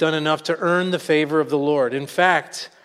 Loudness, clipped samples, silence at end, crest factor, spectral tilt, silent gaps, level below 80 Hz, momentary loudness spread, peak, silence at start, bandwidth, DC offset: -20 LUFS; under 0.1%; 0.2 s; 18 dB; -5 dB/octave; none; -72 dBFS; 4 LU; -2 dBFS; 0 s; 15 kHz; under 0.1%